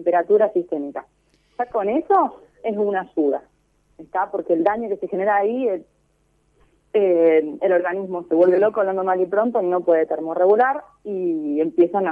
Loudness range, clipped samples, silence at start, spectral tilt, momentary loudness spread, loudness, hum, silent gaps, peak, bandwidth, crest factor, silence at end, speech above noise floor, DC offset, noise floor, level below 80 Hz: 5 LU; under 0.1%; 0 s; -9 dB/octave; 12 LU; -20 LUFS; none; none; -4 dBFS; 4.5 kHz; 16 dB; 0 s; 44 dB; under 0.1%; -63 dBFS; -64 dBFS